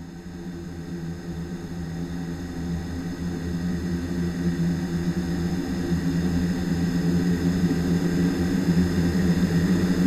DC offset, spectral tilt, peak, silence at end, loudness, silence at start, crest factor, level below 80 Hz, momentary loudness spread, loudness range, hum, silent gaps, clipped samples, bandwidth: under 0.1%; -7 dB/octave; -10 dBFS; 0 s; -25 LUFS; 0 s; 16 dB; -42 dBFS; 11 LU; 8 LU; none; none; under 0.1%; 13.5 kHz